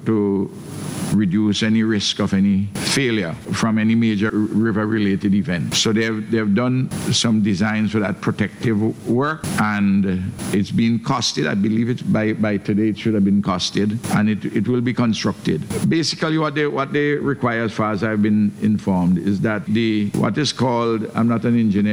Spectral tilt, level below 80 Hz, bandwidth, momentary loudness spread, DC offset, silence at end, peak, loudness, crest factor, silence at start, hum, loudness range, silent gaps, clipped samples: -5.5 dB/octave; -52 dBFS; over 20 kHz; 4 LU; under 0.1%; 0 s; -4 dBFS; -19 LUFS; 14 dB; 0 s; none; 1 LU; none; under 0.1%